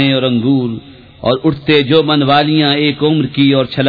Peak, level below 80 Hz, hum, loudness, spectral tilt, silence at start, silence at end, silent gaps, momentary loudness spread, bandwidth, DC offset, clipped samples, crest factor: 0 dBFS; -46 dBFS; none; -12 LUFS; -8.5 dB/octave; 0 s; 0 s; none; 6 LU; 5 kHz; under 0.1%; under 0.1%; 12 dB